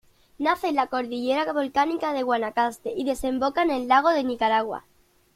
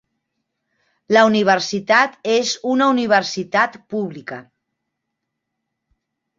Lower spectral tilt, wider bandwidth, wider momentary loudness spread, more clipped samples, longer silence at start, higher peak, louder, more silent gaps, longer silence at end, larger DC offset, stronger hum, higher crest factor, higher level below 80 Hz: about the same, -4 dB/octave vs -4 dB/octave; first, 16 kHz vs 7.8 kHz; second, 7 LU vs 13 LU; neither; second, 0.4 s vs 1.1 s; second, -8 dBFS vs -2 dBFS; second, -24 LUFS vs -17 LUFS; neither; second, 0.55 s vs 2 s; neither; neither; about the same, 18 dB vs 18 dB; first, -54 dBFS vs -66 dBFS